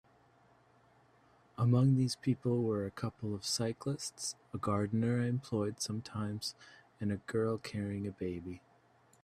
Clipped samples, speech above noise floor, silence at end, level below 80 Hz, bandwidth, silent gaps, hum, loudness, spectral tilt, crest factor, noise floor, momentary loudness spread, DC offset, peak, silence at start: under 0.1%; 32 dB; 0.65 s; -70 dBFS; 14 kHz; none; none; -35 LUFS; -6 dB/octave; 18 dB; -67 dBFS; 10 LU; under 0.1%; -18 dBFS; 1.6 s